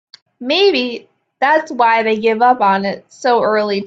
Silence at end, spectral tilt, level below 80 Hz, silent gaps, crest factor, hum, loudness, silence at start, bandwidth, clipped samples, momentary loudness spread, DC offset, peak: 0 s; -4.5 dB/octave; -62 dBFS; none; 14 dB; none; -14 LUFS; 0.4 s; 7.8 kHz; under 0.1%; 10 LU; under 0.1%; 0 dBFS